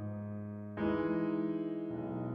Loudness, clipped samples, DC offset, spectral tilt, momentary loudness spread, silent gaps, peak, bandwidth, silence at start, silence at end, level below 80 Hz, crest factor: -37 LUFS; under 0.1%; under 0.1%; -10.5 dB/octave; 9 LU; none; -22 dBFS; 5 kHz; 0 s; 0 s; -66 dBFS; 14 dB